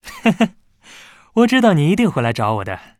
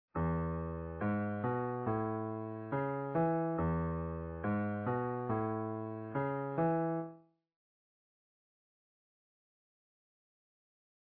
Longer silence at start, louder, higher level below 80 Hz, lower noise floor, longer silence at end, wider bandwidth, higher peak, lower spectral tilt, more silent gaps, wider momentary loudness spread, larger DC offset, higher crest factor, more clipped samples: about the same, 0.05 s vs 0.15 s; first, -16 LUFS vs -37 LUFS; about the same, -52 dBFS vs -56 dBFS; second, -44 dBFS vs -56 dBFS; second, 0.2 s vs 3.8 s; first, 14 kHz vs 3.5 kHz; first, 0 dBFS vs -22 dBFS; second, -6.5 dB/octave vs -9.5 dB/octave; neither; about the same, 8 LU vs 7 LU; neither; about the same, 16 dB vs 16 dB; neither